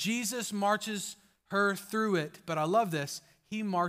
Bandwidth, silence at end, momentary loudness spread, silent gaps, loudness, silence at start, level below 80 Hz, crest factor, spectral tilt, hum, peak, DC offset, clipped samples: 16 kHz; 0 s; 11 LU; none; -32 LUFS; 0 s; -78 dBFS; 16 dB; -4 dB/octave; none; -16 dBFS; under 0.1%; under 0.1%